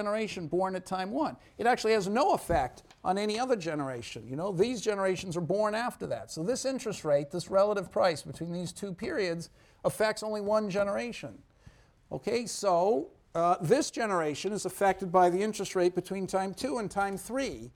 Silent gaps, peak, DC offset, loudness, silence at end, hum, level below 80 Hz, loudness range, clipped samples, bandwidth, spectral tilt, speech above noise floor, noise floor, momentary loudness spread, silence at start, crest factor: none; -12 dBFS; under 0.1%; -30 LUFS; 0.05 s; none; -58 dBFS; 4 LU; under 0.1%; 18 kHz; -5 dB/octave; 28 dB; -58 dBFS; 10 LU; 0 s; 20 dB